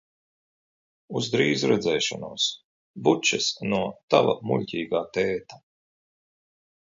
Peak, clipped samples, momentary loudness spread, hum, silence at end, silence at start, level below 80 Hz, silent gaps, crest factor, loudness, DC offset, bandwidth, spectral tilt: -4 dBFS; under 0.1%; 7 LU; none; 1.25 s; 1.1 s; -64 dBFS; 2.64-2.94 s, 4.03-4.08 s; 24 dB; -25 LUFS; under 0.1%; 7.8 kHz; -4 dB/octave